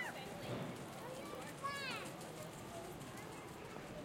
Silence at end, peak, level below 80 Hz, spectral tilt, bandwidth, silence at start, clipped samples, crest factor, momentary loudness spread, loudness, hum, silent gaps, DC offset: 0 s; -32 dBFS; -70 dBFS; -4 dB/octave; 16.5 kHz; 0 s; under 0.1%; 16 dB; 7 LU; -47 LUFS; none; none; under 0.1%